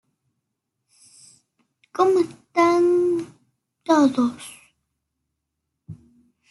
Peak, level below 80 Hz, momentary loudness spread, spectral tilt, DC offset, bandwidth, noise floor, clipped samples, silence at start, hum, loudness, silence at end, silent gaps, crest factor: -6 dBFS; -68 dBFS; 20 LU; -5 dB/octave; under 0.1%; 12 kHz; -80 dBFS; under 0.1%; 1.95 s; none; -20 LUFS; 0.55 s; none; 18 dB